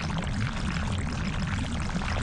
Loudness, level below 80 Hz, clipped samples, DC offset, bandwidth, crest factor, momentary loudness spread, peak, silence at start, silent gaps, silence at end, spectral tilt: -31 LUFS; -36 dBFS; under 0.1%; under 0.1%; 11 kHz; 14 dB; 1 LU; -14 dBFS; 0 s; none; 0 s; -5.5 dB/octave